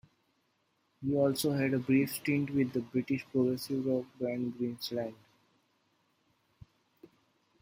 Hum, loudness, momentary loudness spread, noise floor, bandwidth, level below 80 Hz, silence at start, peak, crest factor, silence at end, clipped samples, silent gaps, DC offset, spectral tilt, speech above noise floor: none; -32 LUFS; 8 LU; -76 dBFS; 16.5 kHz; -70 dBFS; 1 s; -16 dBFS; 18 dB; 2.5 s; under 0.1%; none; under 0.1%; -6 dB/octave; 44 dB